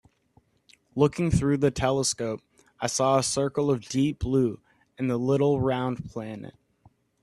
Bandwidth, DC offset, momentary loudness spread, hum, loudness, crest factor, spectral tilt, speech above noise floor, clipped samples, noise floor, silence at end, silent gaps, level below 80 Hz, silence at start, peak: 12.5 kHz; under 0.1%; 14 LU; none; -26 LUFS; 20 dB; -5.5 dB/octave; 39 dB; under 0.1%; -64 dBFS; 0.75 s; none; -48 dBFS; 0.95 s; -8 dBFS